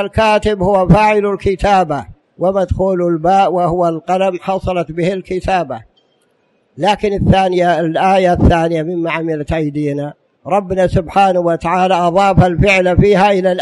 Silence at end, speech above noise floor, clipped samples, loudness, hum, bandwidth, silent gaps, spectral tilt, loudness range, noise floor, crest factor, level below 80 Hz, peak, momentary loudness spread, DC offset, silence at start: 0 s; 46 dB; under 0.1%; -13 LUFS; none; 11.5 kHz; none; -7 dB/octave; 4 LU; -58 dBFS; 12 dB; -30 dBFS; 0 dBFS; 8 LU; under 0.1%; 0 s